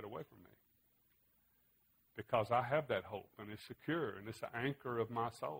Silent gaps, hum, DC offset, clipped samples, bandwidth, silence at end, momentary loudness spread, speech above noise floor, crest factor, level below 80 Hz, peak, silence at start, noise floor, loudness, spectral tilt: none; none; under 0.1%; under 0.1%; 16 kHz; 0 s; 16 LU; 35 dB; 24 dB; -76 dBFS; -20 dBFS; 0 s; -76 dBFS; -40 LUFS; -6.5 dB/octave